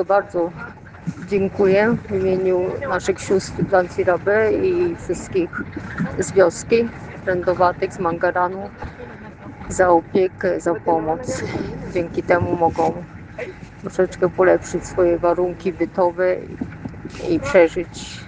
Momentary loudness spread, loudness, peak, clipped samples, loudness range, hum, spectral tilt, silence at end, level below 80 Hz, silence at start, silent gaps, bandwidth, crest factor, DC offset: 16 LU; -20 LUFS; 0 dBFS; under 0.1%; 2 LU; none; -6 dB/octave; 0 s; -44 dBFS; 0 s; none; 9.6 kHz; 20 dB; under 0.1%